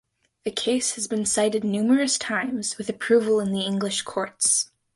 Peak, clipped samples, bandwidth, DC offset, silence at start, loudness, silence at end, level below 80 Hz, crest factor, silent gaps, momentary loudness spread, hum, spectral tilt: -8 dBFS; under 0.1%; 11.5 kHz; under 0.1%; 0.45 s; -23 LUFS; 0.3 s; -66 dBFS; 16 dB; none; 8 LU; none; -3 dB/octave